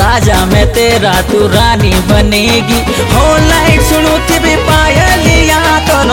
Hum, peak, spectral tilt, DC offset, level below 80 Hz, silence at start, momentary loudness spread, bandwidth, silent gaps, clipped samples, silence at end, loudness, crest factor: none; 0 dBFS; -4.5 dB/octave; under 0.1%; -16 dBFS; 0 s; 2 LU; 17.5 kHz; none; 0.1%; 0 s; -8 LUFS; 8 dB